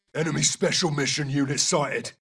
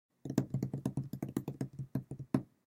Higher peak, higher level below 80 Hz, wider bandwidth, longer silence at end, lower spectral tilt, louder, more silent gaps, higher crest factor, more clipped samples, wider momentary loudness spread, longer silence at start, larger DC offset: first, -8 dBFS vs -14 dBFS; about the same, -60 dBFS vs -64 dBFS; second, 12 kHz vs 16.5 kHz; about the same, 0.1 s vs 0.2 s; second, -3 dB/octave vs -8 dB/octave; first, -23 LUFS vs -39 LUFS; neither; second, 18 dB vs 24 dB; neither; about the same, 4 LU vs 6 LU; about the same, 0.15 s vs 0.25 s; neither